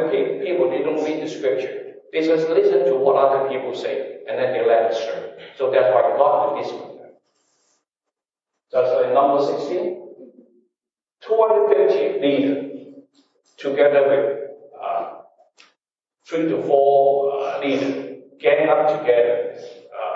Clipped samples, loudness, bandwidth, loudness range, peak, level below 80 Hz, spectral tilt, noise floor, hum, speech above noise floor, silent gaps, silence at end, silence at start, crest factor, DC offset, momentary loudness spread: under 0.1%; -19 LUFS; 7.4 kHz; 4 LU; -2 dBFS; -84 dBFS; -6 dB/octave; -87 dBFS; none; 69 dB; none; 0 s; 0 s; 18 dB; under 0.1%; 14 LU